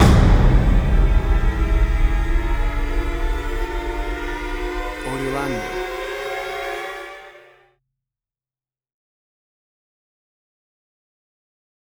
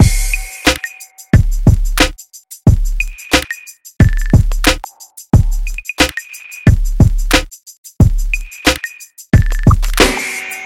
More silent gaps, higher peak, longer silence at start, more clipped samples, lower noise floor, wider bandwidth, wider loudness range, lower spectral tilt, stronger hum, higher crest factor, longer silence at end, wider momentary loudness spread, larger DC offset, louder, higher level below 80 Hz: second, none vs 7.78-7.84 s; about the same, -2 dBFS vs 0 dBFS; about the same, 0 s vs 0 s; neither; first, under -90 dBFS vs -37 dBFS; second, 12 kHz vs 17 kHz; first, 12 LU vs 1 LU; first, -6.5 dB/octave vs -4.5 dB/octave; neither; about the same, 18 dB vs 14 dB; first, 4.7 s vs 0 s; second, 11 LU vs 15 LU; neither; second, -22 LUFS vs -14 LUFS; about the same, -22 dBFS vs -18 dBFS